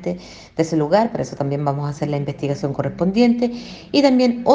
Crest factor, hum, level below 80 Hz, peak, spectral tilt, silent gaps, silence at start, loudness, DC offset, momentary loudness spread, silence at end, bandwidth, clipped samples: 18 dB; none; -50 dBFS; 0 dBFS; -7 dB/octave; none; 0 s; -19 LUFS; under 0.1%; 9 LU; 0 s; 8 kHz; under 0.1%